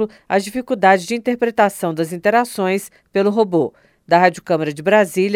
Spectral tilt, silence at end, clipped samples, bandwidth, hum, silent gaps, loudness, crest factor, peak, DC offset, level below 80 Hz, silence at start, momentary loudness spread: -5.5 dB/octave; 0 s; under 0.1%; 16.5 kHz; none; none; -17 LUFS; 16 dB; 0 dBFS; under 0.1%; -60 dBFS; 0 s; 8 LU